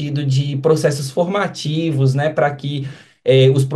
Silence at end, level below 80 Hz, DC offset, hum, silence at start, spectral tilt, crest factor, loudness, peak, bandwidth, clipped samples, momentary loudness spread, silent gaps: 0 s; -60 dBFS; under 0.1%; none; 0 s; -6.5 dB/octave; 14 dB; -17 LUFS; -2 dBFS; 12.5 kHz; under 0.1%; 11 LU; none